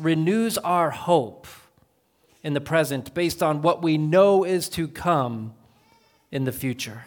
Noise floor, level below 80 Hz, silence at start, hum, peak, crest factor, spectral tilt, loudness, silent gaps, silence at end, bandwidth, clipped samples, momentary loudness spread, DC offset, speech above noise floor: -64 dBFS; -58 dBFS; 0 s; none; -6 dBFS; 18 dB; -5.5 dB/octave; -23 LUFS; none; 0 s; 19 kHz; under 0.1%; 11 LU; under 0.1%; 41 dB